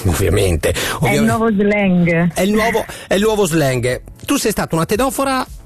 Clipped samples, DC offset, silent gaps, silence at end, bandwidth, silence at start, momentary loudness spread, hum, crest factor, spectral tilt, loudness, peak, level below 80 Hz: under 0.1%; under 0.1%; none; 0.05 s; 14 kHz; 0 s; 5 LU; none; 10 dB; -5 dB/octave; -16 LUFS; -6 dBFS; -34 dBFS